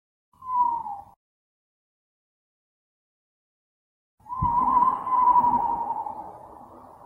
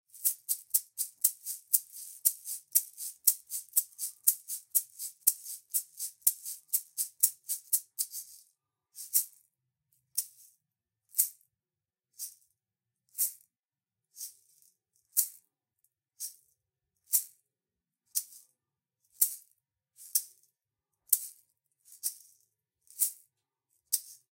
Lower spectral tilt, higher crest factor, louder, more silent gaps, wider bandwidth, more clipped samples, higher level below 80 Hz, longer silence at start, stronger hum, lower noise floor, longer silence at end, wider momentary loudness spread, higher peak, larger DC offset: first, -8.5 dB/octave vs 5.5 dB/octave; second, 18 dB vs 32 dB; first, -23 LUFS vs -31 LUFS; first, 1.16-4.18 s vs none; second, 3.2 kHz vs 17 kHz; neither; first, -52 dBFS vs -84 dBFS; first, 0.4 s vs 0.15 s; neither; second, -47 dBFS vs under -90 dBFS; about the same, 0.25 s vs 0.2 s; first, 20 LU vs 16 LU; second, -10 dBFS vs -4 dBFS; neither